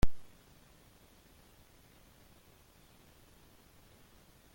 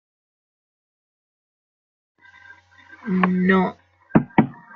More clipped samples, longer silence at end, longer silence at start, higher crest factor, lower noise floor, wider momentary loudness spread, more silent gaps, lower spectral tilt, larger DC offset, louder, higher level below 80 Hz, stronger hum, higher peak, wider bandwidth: neither; first, 4.35 s vs 0.2 s; second, 0.05 s vs 2.9 s; about the same, 24 dB vs 24 dB; first, -62 dBFS vs -49 dBFS; second, 1 LU vs 9 LU; neither; second, -6 dB/octave vs -10 dB/octave; neither; second, -55 LUFS vs -20 LUFS; first, -48 dBFS vs -58 dBFS; neither; second, -14 dBFS vs 0 dBFS; first, 17 kHz vs 4.5 kHz